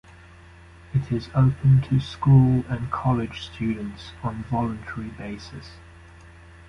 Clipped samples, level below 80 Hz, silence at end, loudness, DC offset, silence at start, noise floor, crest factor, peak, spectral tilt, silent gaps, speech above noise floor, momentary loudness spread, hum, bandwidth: under 0.1%; -44 dBFS; 0.9 s; -23 LUFS; under 0.1%; 0.95 s; -47 dBFS; 18 dB; -6 dBFS; -8.5 dB/octave; none; 25 dB; 18 LU; none; 6.6 kHz